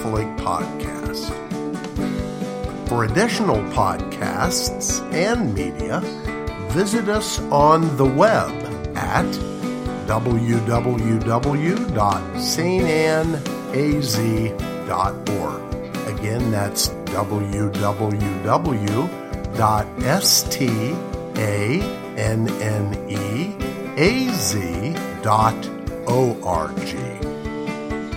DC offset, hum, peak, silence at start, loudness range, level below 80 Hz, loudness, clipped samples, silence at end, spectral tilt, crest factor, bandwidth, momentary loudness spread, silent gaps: under 0.1%; none; 0 dBFS; 0 s; 4 LU; -36 dBFS; -21 LUFS; under 0.1%; 0 s; -5 dB/octave; 20 dB; 16.5 kHz; 10 LU; none